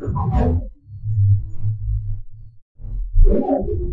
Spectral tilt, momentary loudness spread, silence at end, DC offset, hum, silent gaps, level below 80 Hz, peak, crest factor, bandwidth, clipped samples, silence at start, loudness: -12 dB/octave; 16 LU; 0 s; under 0.1%; none; 2.62-2.75 s; -22 dBFS; -4 dBFS; 14 dB; 2.8 kHz; under 0.1%; 0 s; -21 LUFS